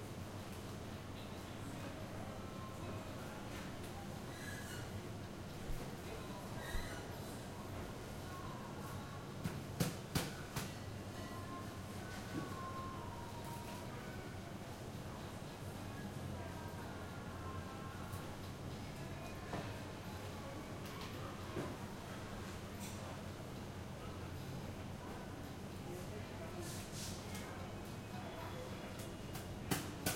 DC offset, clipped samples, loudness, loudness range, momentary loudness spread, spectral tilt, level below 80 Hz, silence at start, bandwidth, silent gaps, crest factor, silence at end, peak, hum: under 0.1%; under 0.1%; -47 LUFS; 3 LU; 4 LU; -5 dB/octave; -58 dBFS; 0 s; 16.5 kHz; none; 24 dB; 0 s; -22 dBFS; none